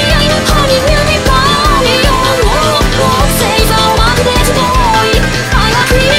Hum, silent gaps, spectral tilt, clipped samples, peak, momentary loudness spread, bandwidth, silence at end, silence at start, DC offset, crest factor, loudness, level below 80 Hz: none; none; -4 dB/octave; 0.4%; 0 dBFS; 1 LU; 16.5 kHz; 0 s; 0 s; under 0.1%; 8 dB; -9 LUFS; -16 dBFS